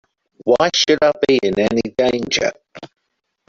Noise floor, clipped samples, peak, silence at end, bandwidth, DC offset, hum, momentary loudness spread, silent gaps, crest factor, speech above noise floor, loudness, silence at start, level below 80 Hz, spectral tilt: -73 dBFS; under 0.1%; 0 dBFS; 0.6 s; 7.8 kHz; under 0.1%; none; 5 LU; none; 18 dB; 56 dB; -16 LUFS; 0.45 s; -52 dBFS; -3.5 dB/octave